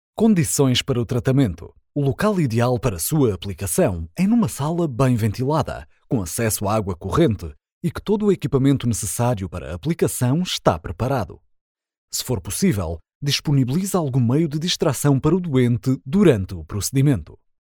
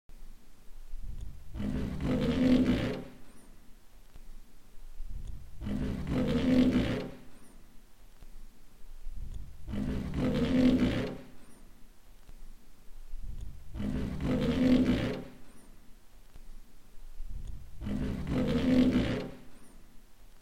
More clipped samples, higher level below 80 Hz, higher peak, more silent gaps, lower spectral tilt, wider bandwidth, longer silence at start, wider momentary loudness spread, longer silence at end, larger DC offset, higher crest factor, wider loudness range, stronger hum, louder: neither; about the same, -42 dBFS vs -42 dBFS; first, -2 dBFS vs -14 dBFS; first, 7.72-7.81 s, 11.61-11.75 s, 11.98-12.08 s, 13.15-13.21 s vs none; second, -5.5 dB/octave vs -7.5 dB/octave; first, 19.5 kHz vs 13 kHz; about the same, 0.15 s vs 0.1 s; second, 9 LU vs 22 LU; first, 0.3 s vs 0 s; neither; about the same, 18 dB vs 18 dB; second, 4 LU vs 9 LU; neither; first, -21 LUFS vs -30 LUFS